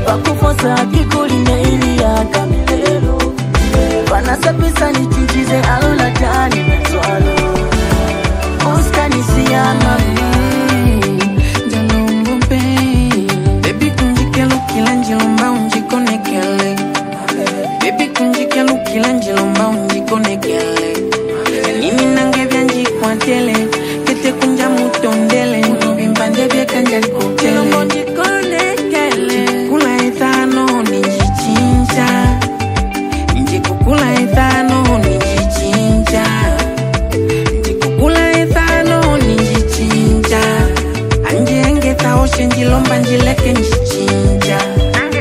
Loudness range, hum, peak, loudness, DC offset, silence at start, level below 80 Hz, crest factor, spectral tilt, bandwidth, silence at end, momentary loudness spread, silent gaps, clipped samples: 2 LU; none; 0 dBFS; -13 LUFS; under 0.1%; 0 s; -20 dBFS; 12 dB; -5.5 dB/octave; 16 kHz; 0 s; 4 LU; none; under 0.1%